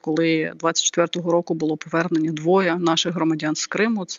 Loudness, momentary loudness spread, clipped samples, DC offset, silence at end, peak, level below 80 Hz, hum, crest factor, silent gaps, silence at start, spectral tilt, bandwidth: -21 LUFS; 4 LU; under 0.1%; under 0.1%; 0 s; -4 dBFS; -72 dBFS; none; 16 dB; none; 0.05 s; -4 dB/octave; 7.8 kHz